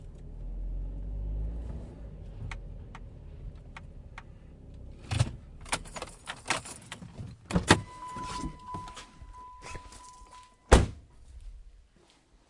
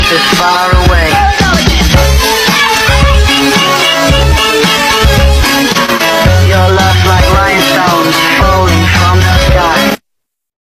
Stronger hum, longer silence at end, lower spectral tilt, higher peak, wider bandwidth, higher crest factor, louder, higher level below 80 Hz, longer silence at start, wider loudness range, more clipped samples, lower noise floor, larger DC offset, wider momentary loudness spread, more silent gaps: neither; about the same, 0.65 s vs 0.7 s; about the same, -4.5 dB/octave vs -4 dB/octave; about the same, -2 dBFS vs 0 dBFS; second, 11.5 kHz vs 16.5 kHz; first, 32 dB vs 8 dB; second, -33 LUFS vs -7 LUFS; second, -38 dBFS vs -14 dBFS; about the same, 0 s vs 0 s; first, 11 LU vs 0 LU; second, under 0.1% vs 0.7%; second, -62 dBFS vs -71 dBFS; neither; first, 25 LU vs 1 LU; neither